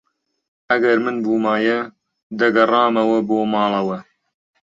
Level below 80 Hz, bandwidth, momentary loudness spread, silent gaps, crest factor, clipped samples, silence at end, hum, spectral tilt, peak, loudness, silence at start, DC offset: -66 dBFS; 7.6 kHz; 10 LU; 2.23-2.30 s; 18 dB; under 0.1%; 0.7 s; none; -6.5 dB/octave; -2 dBFS; -18 LUFS; 0.7 s; under 0.1%